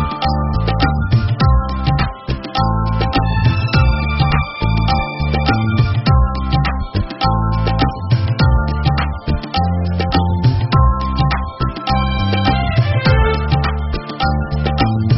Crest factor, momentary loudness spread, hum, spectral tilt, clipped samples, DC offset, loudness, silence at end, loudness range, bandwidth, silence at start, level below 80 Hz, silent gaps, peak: 14 dB; 5 LU; none; -5.5 dB/octave; under 0.1%; under 0.1%; -16 LUFS; 0 s; 1 LU; 6 kHz; 0 s; -20 dBFS; none; 0 dBFS